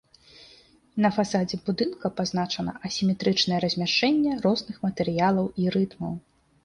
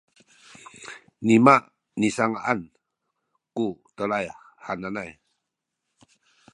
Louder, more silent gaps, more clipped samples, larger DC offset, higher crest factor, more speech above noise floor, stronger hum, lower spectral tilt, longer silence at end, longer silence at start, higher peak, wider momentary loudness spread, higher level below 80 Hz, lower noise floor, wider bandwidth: about the same, -25 LUFS vs -23 LUFS; neither; neither; neither; second, 16 dB vs 26 dB; second, 31 dB vs 60 dB; neither; about the same, -5.5 dB/octave vs -6 dB/octave; second, 0.45 s vs 1.45 s; second, 0.4 s vs 0.8 s; second, -10 dBFS vs 0 dBFS; second, 8 LU vs 24 LU; first, -58 dBFS vs -66 dBFS; second, -56 dBFS vs -82 dBFS; about the same, 10.5 kHz vs 11 kHz